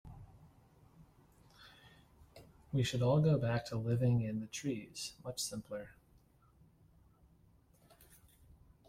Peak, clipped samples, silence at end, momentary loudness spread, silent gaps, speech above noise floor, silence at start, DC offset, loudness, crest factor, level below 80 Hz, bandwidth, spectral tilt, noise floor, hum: -20 dBFS; under 0.1%; 2.95 s; 25 LU; none; 32 dB; 0.05 s; under 0.1%; -36 LUFS; 18 dB; -64 dBFS; 15.5 kHz; -6 dB/octave; -67 dBFS; none